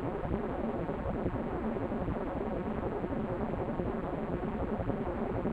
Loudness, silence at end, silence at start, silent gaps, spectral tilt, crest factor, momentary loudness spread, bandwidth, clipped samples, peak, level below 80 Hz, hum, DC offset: -35 LUFS; 0 s; 0 s; none; -10 dB/octave; 18 dB; 1 LU; 8.2 kHz; under 0.1%; -16 dBFS; -44 dBFS; none; under 0.1%